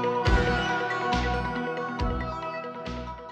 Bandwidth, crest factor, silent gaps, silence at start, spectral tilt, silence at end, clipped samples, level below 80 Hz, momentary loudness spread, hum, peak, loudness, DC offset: 8.8 kHz; 18 dB; none; 0 s; -6 dB/octave; 0 s; under 0.1%; -34 dBFS; 11 LU; none; -10 dBFS; -28 LUFS; under 0.1%